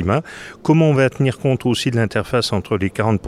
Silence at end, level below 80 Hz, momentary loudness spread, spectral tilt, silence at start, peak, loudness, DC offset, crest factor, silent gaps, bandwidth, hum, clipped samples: 0 s; -46 dBFS; 7 LU; -6.5 dB/octave; 0 s; -4 dBFS; -18 LUFS; under 0.1%; 14 dB; none; 14 kHz; none; under 0.1%